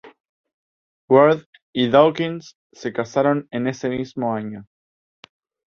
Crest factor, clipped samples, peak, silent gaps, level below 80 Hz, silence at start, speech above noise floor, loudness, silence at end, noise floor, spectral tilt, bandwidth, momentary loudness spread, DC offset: 20 dB; under 0.1%; -2 dBFS; 0.20-0.44 s, 0.54-1.08 s, 1.46-1.53 s, 1.62-1.73 s, 2.55-2.70 s; -62 dBFS; 0.05 s; over 71 dB; -20 LUFS; 1.05 s; under -90 dBFS; -6.5 dB/octave; 7 kHz; 16 LU; under 0.1%